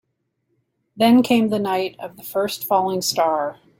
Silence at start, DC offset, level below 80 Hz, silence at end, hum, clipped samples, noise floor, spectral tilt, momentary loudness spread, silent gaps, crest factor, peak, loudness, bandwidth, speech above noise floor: 0.95 s; under 0.1%; -64 dBFS; 0.25 s; none; under 0.1%; -72 dBFS; -4.5 dB/octave; 10 LU; none; 16 dB; -4 dBFS; -19 LUFS; 16.5 kHz; 53 dB